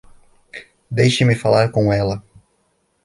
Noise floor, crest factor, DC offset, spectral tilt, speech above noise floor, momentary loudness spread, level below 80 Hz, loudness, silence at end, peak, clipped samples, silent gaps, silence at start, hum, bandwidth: -65 dBFS; 16 dB; under 0.1%; -6 dB/octave; 49 dB; 22 LU; -46 dBFS; -17 LUFS; 0.85 s; -2 dBFS; under 0.1%; none; 0.55 s; none; 11.5 kHz